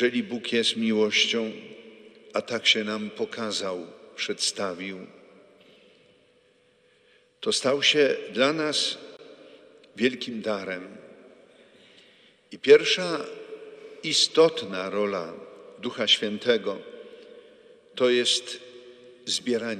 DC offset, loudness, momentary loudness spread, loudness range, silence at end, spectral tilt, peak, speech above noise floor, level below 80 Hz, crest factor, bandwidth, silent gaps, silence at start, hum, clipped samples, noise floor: under 0.1%; -24 LUFS; 22 LU; 10 LU; 0 s; -2.5 dB/octave; -4 dBFS; 37 dB; -80 dBFS; 24 dB; 13 kHz; none; 0 s; none; under 0.1%; -62 dBFS